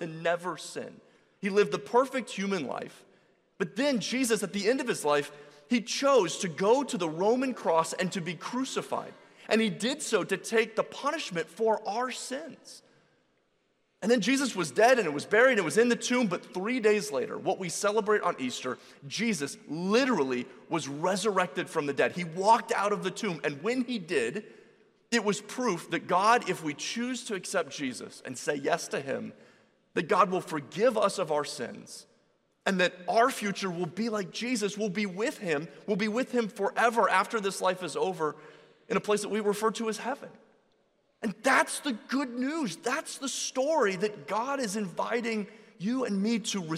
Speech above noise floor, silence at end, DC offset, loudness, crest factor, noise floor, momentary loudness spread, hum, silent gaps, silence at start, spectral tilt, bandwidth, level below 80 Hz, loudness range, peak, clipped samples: 44 dB; 0 s; under 0.1%; -29 LUFS; 20 dB; -73 dBFS; 11 LU; none; none; 0 s; -4 dB/octave; 15 kHz; -78 dBFS; 5 LU; -10 dBFS; under 0.1%